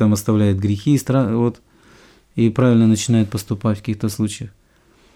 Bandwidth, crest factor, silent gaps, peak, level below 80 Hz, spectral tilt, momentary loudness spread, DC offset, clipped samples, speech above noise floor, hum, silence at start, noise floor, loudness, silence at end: 16.5 kHz; 14 dB; none; -4 dBFS; -52 dBFS; -6.5 dB/octave; 9 LU; under 0.1%; under 0.1%; 37 dB; none; 0 s; -54 dBFS; -18 LUFS; 0.65 s